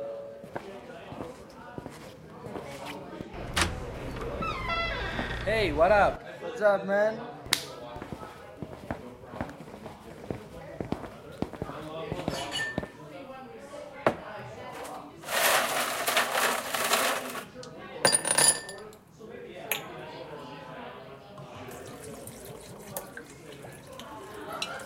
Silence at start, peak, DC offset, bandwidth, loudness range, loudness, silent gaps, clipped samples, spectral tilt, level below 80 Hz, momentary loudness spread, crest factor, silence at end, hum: 0 s; -2 dBFS; under 0.1%; 16 kHz; 15 LU; -29 LUFS; none; under 0.1%; -2.5 dB/octave; -50 dBFS; 20 LU; 30 dB; 0 s; none